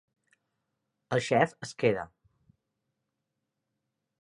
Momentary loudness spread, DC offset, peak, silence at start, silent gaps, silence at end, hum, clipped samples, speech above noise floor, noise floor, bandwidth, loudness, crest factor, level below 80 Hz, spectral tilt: 9 LU; under 0.1%; -8 dBFS; 1.1 s; none; 2.15 s; none; under 0.1%; 56 dB; -84 dBFS; 11.5 kHz; -29 LUFS; 26 dB; -70 dBFS; -5.5 dB/octave